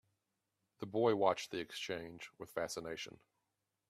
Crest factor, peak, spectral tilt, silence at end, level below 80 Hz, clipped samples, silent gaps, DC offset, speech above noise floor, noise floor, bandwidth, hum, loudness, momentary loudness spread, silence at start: 24 dB; -16 dBFS; -4.5 dB/octave; 0.8 s; -76 dBFS; under 0.1%; none; under 0.1%; 49 dB; -87 dBFS; 15 kHz; none; -39 LUFS; 18 LU; 0.8 s